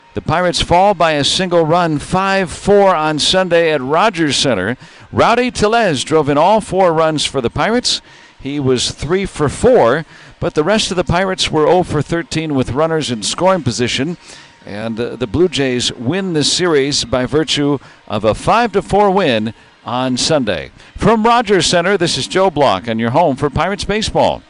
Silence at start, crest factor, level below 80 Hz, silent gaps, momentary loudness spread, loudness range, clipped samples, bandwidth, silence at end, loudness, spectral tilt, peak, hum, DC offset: 0.15 s; 12 dB; -38 dBFS; none; 8 LU; 3 LU; under 0.1%; 11 kHz; 0.1 s; -14 LUFS; -4.5 dB/octave; -2 dBFS; none; under 0.1%